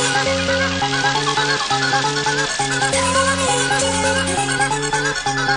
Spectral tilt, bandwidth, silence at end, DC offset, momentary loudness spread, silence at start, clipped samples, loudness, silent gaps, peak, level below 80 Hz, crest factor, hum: -2.5 dB/octave; 10.5 kHz; 0 s; under 0.1%; 2 LU; 0 s; under 0.1%; -17 LUFS; none; -4 dBFS; -44 dBFS; 14 dB; none